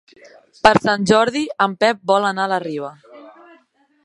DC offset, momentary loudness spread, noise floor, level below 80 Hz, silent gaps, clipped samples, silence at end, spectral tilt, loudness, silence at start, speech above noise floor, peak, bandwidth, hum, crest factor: under 0.1%; 11 LU; -56 dBFS; -54 dBFS; none; under 0.1%; 0.75 s; -4.5 dB/octave; -17 LUFS; 0.65 s; 39 dB; 0 dBFS; 11.5 kHz; none; 20 dB